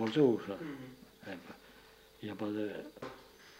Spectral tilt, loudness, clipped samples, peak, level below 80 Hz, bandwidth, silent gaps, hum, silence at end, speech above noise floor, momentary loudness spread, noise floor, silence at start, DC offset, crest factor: -7 dB/octave; -37 LUFS; under 0.1%; -16 dBFS; -72 dBFS; 16 kHz; none; none; 0 s; 24 dB; 24 LU; -60 dBFS; 0 s; under 0.1%; 22 dB